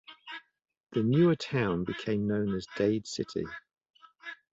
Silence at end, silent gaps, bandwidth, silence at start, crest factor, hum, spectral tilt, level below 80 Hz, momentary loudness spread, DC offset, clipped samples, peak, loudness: 0.2 s; 0.80-0.84 s; 8 kHz; 0.1 s; 16 dB; none; -6.5 dB/octave; -60 dBFS; 20 LU; under 0.1%; under 0.1%; -14 dBFS; -30 LUFS